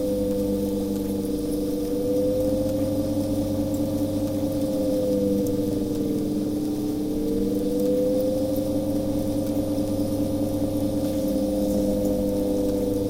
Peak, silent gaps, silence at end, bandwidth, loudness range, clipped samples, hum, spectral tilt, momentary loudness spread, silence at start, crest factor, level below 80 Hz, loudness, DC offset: -10 dBFS; none; 0 s; 16.5 kHz; 1 LU; under 0.1%; none; -7 dB/octave; 3 LU; 0 s; 12 dB; -40 dBFS; -25 LUFS; under 0.1%